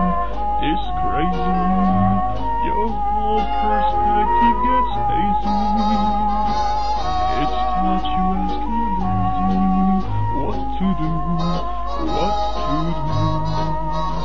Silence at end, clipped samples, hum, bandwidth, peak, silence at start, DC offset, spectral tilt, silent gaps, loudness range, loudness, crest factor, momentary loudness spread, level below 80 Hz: 0 s; under 0.1%; none; 7.2 kHz; -6 dBFS; 0 s; 7%; -7.5 dB/octave; none; 4 LU; -20 LUFS; 14 dB; 5 LU; -28 dBFS